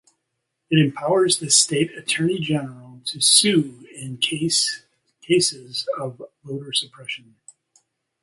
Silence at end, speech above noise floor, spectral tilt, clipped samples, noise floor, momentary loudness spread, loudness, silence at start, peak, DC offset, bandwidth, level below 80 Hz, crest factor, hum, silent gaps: 1.05 s; 56 dB; -3 dB/octave; under 0.1%; -77 dBFS; 19 LU; -19 LUFS; 0.7 s; -2 dBFS; under 0.1%; 12 kHz; -66 dBFS; 22 dB; none; none